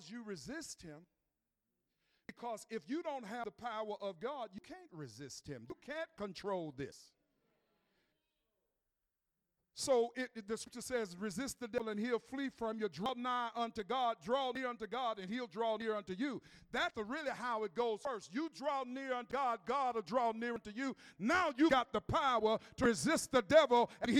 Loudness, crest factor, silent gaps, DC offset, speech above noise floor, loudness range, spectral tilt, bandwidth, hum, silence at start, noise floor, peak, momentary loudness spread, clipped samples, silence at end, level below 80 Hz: -38 LUFS; 24 dB; none; under 0.1%; 51 dB; 12 LU; -4 dB/octave; 15.5 kHz; none; 0 s; -89 dBFS; -16 dBFS; 16 LU; under 0.1%; 0 s; -68 dBFS